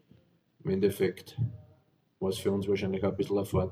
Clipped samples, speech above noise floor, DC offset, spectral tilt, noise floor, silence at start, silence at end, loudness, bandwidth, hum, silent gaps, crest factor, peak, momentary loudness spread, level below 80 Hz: under 0.1%; 37 dB; under 0.1%; -7 dB/octave; -66 dBFS; 0.65 s; 0 s; -31 LUFS; 16 kHz; none; none; 18 dB; -14 dBFS; 7 LU; -60 dBFS